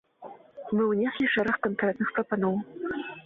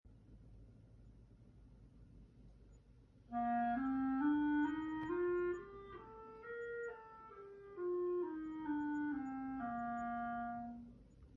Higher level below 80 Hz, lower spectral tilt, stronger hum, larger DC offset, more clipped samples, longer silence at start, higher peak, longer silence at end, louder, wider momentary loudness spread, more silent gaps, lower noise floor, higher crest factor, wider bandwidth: about the same, -66 dBFS vs -66 dBFS; first, -8 dB/octave vs -6 dB/octave; neither; neither; neither; first, 0.2 s vs 0.05 s; first, -12 dBFS vs -28 dBFS; about the same, 0.05 s vs 0 s; first, -28 LUFS vs -41 LUFS; about the same, 20 LU vs 19 LU; neither; second, -48 dBFS vs -65 dBFS; about the same, 16 dB vs 16 dB; second, 5 kHz vs 7 kHz